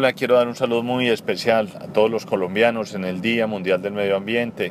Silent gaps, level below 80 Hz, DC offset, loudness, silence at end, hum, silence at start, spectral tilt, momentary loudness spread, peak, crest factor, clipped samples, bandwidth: none; -66 dBFS; under 0.1%; -21 LUFS; 0 s; none; 0 s; -5.5 dB/octave; 5 LU; -2 dBFS; 18 dB; under 0.1%; 15 kHz